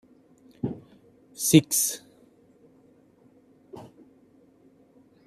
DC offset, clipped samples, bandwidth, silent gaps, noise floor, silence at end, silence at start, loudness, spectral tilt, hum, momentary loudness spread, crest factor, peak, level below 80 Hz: under 0.1%; under 0.1%; 14.5 kHz; none; -59 dBFS; 1.4 s; 0.65 s; -23 LUFS; -4 dB/octave; none; 28 LU; 26 dB; -4 dBFS; -68 dBFS